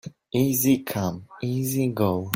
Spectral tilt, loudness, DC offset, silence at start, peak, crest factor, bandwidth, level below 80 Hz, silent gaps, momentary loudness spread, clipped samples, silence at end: -5.5 dB/octave; -24 LUFS; under 0.1%; 0.05 s; -6 dBFS; 20 dB; 16.5 kHz; -58 dBFS; none; 9 LU; under 0.1%; 0 s